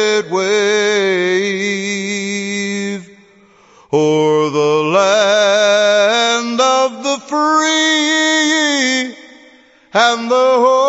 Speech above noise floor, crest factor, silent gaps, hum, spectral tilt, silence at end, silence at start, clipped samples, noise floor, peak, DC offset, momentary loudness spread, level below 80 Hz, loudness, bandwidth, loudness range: 34 dB; 14 dB; none; none; -3 dB/octave; 0 s; 0 s; under 0.1%; -47 dBFS; 0 dBFS; under 0.1%; 8 LU; -70 dBFS; -13 LUFS; 8.2 kHz; 5 LU